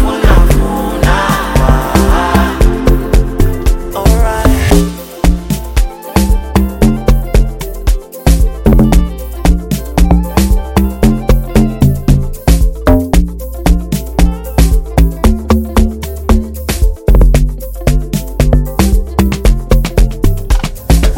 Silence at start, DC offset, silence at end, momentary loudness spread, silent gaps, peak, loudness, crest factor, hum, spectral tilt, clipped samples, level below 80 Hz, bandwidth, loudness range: 0 s; 0.5%; 0 s; 6 LU; none; 0 dBFS; -12 LUFS; 10 dB; none; -6 dB/octave; under 0.1%; -12 dBFS; 17 kHz; 2 LU